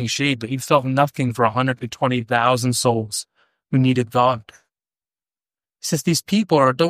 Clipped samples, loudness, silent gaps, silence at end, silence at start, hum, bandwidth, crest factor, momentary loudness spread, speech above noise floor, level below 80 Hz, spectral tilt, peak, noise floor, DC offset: under 0.1%; -20 LUFS; none; 0 s; 0 s; none; 15.5 kHz; 18 dB; 7 LU; over 71 dB; -60 dBFS; -5 dB/octave; -2 dBFS; under -90 dBFS; under 0.1%